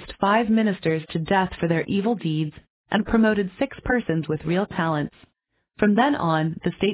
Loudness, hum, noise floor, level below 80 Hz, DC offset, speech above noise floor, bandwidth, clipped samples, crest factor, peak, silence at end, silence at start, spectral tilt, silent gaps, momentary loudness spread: -23 LUFS; none; -70 dBFS; -48 dBFS; under 0.1%; 48 dB; 4 kHz; under 0.1%; 16 dB; -6 dBFS; 0 s; 0 s; -11 dB/octave; 2.70-2.84 s; 7 LU